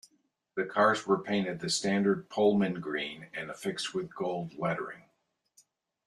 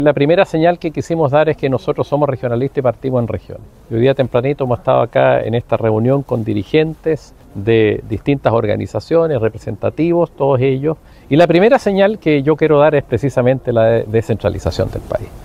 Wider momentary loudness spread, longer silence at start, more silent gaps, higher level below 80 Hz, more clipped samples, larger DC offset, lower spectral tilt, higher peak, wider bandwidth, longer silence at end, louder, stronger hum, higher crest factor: first, 12 LU vs 9 LU; first, 0.55 s vs 0 s; neither; second, -72 dBFS vs -40 dBFS; neither; neither; second, -4.5 dB/octave vs -8 dB/octave; second, -12 dBFS vs 0 dBFS; about the same, 12.5 kHz vs 12.5 kHz; first, 1.05 s vs 0 s; second, -31 LUFS vs -15 LUFS; neither; first, 20 dB vs 14 dB